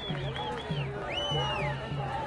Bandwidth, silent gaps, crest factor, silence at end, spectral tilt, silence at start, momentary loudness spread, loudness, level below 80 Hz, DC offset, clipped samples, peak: 11 kHz; none; 14 dB; 0 s; -5.5 dB/octave; 0 s; 5 LU; -32 LUFS; -48 dBFS; under 0.1%; under 0.1%; -18 dBFS